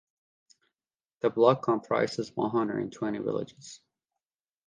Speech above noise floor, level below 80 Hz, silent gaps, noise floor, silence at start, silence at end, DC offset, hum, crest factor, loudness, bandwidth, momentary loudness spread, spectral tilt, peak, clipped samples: over 62 dB; -72 dBFS; none; under -90 dBFS; 1.25 s; 0.9 s; under 0.1%; none; 22 dB; -28 LUFS; 9.6 kHz; 14 LU; -6.5 dB/octave; -8 dBFS; under 0.1%